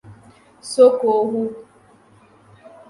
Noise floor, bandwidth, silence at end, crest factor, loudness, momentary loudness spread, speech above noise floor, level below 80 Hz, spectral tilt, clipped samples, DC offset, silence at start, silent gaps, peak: -52 dBFS; 11.5 kHz; 1.3 s; 18 dB; -17 LUFS; 23 LU; 35 dB; -66 dBFS; -5 dB/octave; under 0.1%; under 0.1%; 0.1 s; none; -2 dBFS